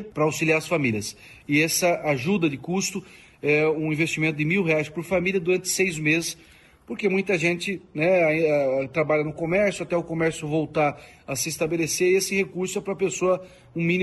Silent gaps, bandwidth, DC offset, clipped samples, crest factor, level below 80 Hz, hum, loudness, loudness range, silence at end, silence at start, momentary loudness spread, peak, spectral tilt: none; 12.5 kHz; under 0.1%; under 0.1%; 16 dB; -58 dBFS; none; -23 LUFS; 2 LU; 0 s; 0 s; 8 LU; -8 dBFS; -4.5 dB/octave